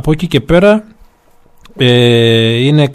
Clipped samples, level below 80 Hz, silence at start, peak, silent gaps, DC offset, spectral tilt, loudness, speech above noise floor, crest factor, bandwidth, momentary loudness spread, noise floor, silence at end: 0.1%; -32 dBFS; 0.05 s; 0 dBFS; none; under 0.1%; -6.5 dB/octave; -10 LUFS; 36 dB; 10 dB; 13.5 kHz; 6 LU; -45 dBFS; 0 s